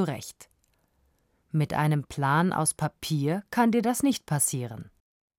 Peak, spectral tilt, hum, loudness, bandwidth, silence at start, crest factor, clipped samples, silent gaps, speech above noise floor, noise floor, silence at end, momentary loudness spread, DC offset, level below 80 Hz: -12 dBFS; -5 dB/octave; none; -26 LUFS; 16.5 kHz; 0 s; 16 dB; under 0.1%; none; 43 dB; -69 dBFS; 0.5 s; 12 LU; under 0.1%; -62 dBFS